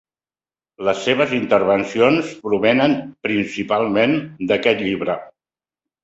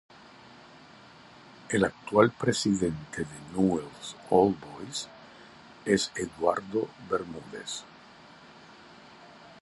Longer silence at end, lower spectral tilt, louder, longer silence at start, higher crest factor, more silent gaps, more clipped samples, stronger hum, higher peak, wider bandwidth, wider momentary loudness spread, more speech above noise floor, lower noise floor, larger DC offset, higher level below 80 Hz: first, 0.75 s vs 0.1 s; about the same, -5.5 dB/octave vs -5 dB/octave; first, -18 LUFS vs -29 LUFS; second, 0.8 s vs 1.65 s; second, 18 dB vs 24 dB; neither; neither; neither; first, -2 dBFS vs -6 dBFS; second, 8 kHz vs 11.5 kHz; second, 7 LU vs 26 LU; first, over 72 dB vs 24 dB; first, under -90 dBFS vs -52 dBFS; neither; about the same, -58 dBFS vs -60 dBFS